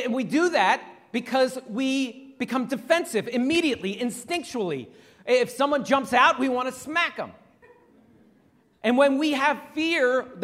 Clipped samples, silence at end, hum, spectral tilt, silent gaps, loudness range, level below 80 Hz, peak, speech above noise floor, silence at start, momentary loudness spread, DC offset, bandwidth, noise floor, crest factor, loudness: under 0.1%; 0 s; none; -4 dB/octave; none; 2 LU; -68 dBFS; -6 dBFS; 37 dB; 0 s; 10 LU; under 0.1%; 15.5 kHz; -61 dBFS; 20 dB; -24 LUFS